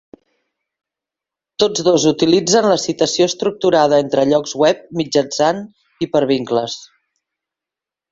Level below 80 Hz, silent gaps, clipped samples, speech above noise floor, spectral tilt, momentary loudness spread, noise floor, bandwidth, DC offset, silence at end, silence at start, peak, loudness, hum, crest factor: -58 dBFS; none; under 0.1%; 72 dB; -4 dB/octave; 8 LU; -87 dBFS; 7.8 kHz; under 0.1%; 1.25 s; 1.6 s; -2 dBFS; -16 LUFS; none; 16 dB